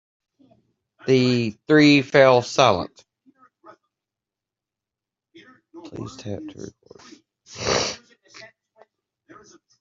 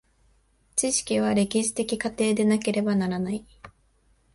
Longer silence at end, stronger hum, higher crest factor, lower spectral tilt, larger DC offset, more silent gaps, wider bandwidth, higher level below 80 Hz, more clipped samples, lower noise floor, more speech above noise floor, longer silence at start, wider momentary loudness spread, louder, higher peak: first, 1.85 s vs 0.65 s; neither; about the same, 22 dB vs 18 dB; about the same, -5 dB/octave vs -4.5 dB/octave; neither; neither; second, 7.8 kHz vs 11.5 kHz; about the same, -60 dBFS vs -58 dBFS; neither; first, -88 dBFS vs -64 dBFS; first, 68 dB vs 39 dB; first, 1.05 s vs 0.75 s; first, 24 LU vs 6 LU; first, -18 LUFS vs -25 LUFS; first, -2 dBFS vs -8 dBFS